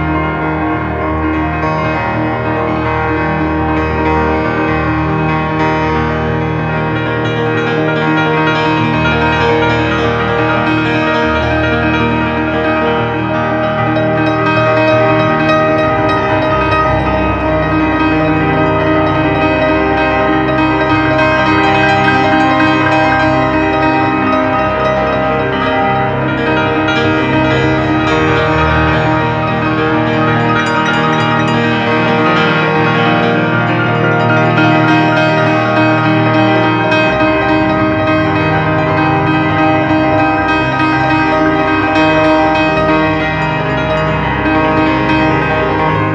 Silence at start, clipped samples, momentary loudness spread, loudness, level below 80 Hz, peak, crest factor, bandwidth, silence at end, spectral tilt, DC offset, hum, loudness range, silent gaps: 0 s; under 0.1%; 4 LU; -12 LUFS; -30 dBFS; 0 dBFS; 12 dB; 8 kHz; 0 s; -7 dB/octave; under 0.1%; none; 3 LU; none